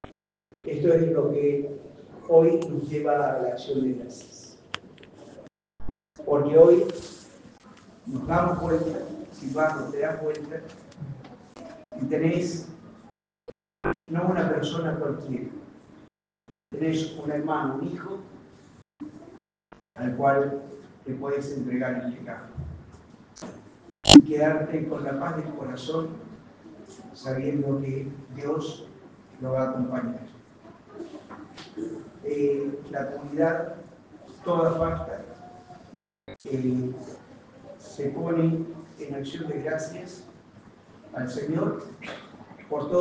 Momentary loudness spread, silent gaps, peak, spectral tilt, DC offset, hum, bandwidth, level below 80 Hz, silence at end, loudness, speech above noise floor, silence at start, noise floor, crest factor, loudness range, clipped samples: 22 LU; none; 0 dBFS; -5.5 dB/octave; under 0.1%; none; 9.6 kHz; -54 dBFS; 0 s; -25 LUFS; 38 dB; 0.05 s; -64 dBFS; 28 dB; 11 LU; under 0.1%